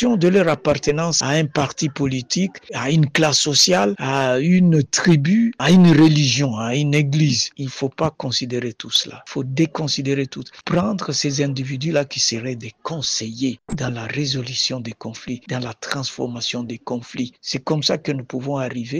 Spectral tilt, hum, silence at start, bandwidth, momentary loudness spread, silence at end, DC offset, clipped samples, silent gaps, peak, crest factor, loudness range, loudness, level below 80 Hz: -4.5 dB/octave; none; 0 s; 13.5 kHz; 13 LU; 0 s; under 0.1%; under 0.1%; none; -4 dBFS; 14 dB; 9 LU; -19 LUFS; -52 dBFS